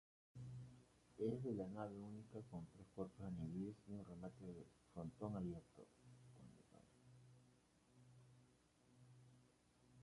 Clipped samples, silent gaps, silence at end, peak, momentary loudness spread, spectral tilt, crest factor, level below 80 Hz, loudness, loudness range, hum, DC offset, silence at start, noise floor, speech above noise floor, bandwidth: under 0.1%; none; 0 s; -32 dBFS; 20 LU; -8.5 dB/octave; 22 dB; -74 dBFS; -52 LUFS; 18 LU; none; under 0.1%; 0.35 s; -75 dBFS; 24 dB; 11 kHz